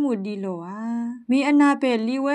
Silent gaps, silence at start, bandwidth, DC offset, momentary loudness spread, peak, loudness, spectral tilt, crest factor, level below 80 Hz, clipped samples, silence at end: none; 0 s; 10 kHz; under 0.1%; 13 LU; -8 dBFS; -22 LUFS; -6 dB/octave; 14 dB; -80 dBFS; under 0.1%; 0 s